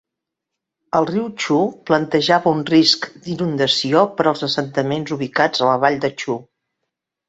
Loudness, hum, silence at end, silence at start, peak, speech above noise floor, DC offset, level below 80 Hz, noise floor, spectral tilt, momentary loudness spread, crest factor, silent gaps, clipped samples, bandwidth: -18 LUFS; none; 0.85 s; 0.95 s; 0 dBFS; 64 dB; under 0.1%; -60 dBFS; -82 dBFS; -5 dB/octave; 8 LU; 18 dB; none; under 0.1%; 8 kHz